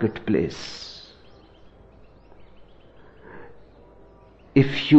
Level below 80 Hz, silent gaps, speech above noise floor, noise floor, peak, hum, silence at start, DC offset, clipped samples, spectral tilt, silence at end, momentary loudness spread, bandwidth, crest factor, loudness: -54 dBFS; none; 31 dB; -51 dBFS; -4 dBFS; none; 0 s; under 0.1%; under 0.1%; -7 dB/octave; 0 s; 26 LU; 8 kHz; 22 dB; -25 LUFS